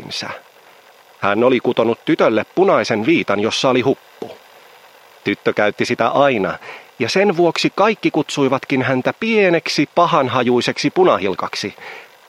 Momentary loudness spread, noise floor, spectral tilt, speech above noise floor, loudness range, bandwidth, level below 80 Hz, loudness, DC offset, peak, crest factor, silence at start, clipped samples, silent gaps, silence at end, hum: 11 LU; -47 dBFS; -5 dB/octave; 30 dB; 3 LU; 15.5 kHz; -64 dBFS; -16 LUFS; under 0.1%; 0 dBFS; 16 dB; 0 s; under 0.1%; none; 0.25 s; none